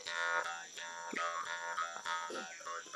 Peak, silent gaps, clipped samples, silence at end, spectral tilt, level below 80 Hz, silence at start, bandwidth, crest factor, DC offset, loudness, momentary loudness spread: -20 dBFS; none; under 0.1%; 0 s; 0 dB/octave; -90 dBFS; 0 s; 13.5 kHz; 20 dB; under 0.1%; -40 LUFS; 9 LU